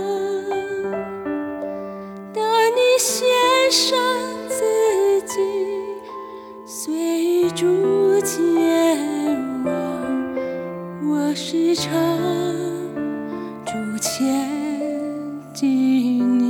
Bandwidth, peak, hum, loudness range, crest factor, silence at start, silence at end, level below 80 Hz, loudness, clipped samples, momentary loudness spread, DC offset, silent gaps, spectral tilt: 18.5 kHz; -4 dBFS; none; 5 LU; 16 dB; 0 s; 0 s; -62 dBFS; -20 LUFS; under 0.1%; 13 LU; under 0.1%; none; -3.5 dB/octave